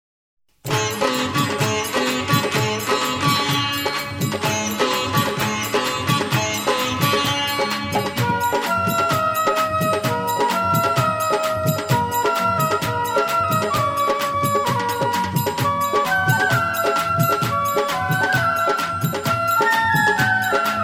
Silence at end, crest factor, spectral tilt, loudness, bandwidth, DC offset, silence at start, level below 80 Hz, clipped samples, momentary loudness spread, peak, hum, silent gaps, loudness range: 0 s; 16 dB; -4 dB/octave; -19 LUFS; 17 kHz; under 0.1%; 0.65 s; -52 dBFS; under 0.1%; 4 LU; -4 dBFS; none; none; 1 LU